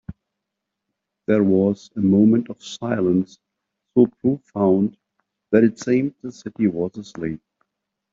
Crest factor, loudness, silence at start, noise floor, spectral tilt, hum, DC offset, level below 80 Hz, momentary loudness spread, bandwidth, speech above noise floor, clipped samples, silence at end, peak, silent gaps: 18 dB; -20 LUFS; 0.1 s; -81 dBFS; -8 dB/octave; none; under 0.1%; -58 dBFS; 16 LU; 7.6 kHz; 62 dB; under 0.1%; 0.75 s; -2 dBFS; none